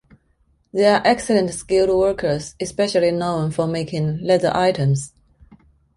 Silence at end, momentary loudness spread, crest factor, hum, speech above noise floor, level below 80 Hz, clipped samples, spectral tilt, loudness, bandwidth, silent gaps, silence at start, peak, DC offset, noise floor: 0.9 s; 8 LU; 18 dB; none; 43 dB; -48 dBFS; under 0.1%; -5.5 dB/octave; -19 LUFS; 11.5 kHz; none; 0.75 s; -2 dBFS; under 0.1%; -62 dBFS